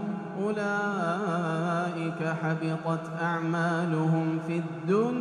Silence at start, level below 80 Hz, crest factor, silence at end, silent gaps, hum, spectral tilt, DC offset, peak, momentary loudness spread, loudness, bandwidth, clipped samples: 0 s; -74 dBFS; 14 dB; 0 s; none; none; -7.5 dB/octave; under 0.1%; -14 dBFS; 5 LU; -29 LUFS; 10 kHz; under 0.1%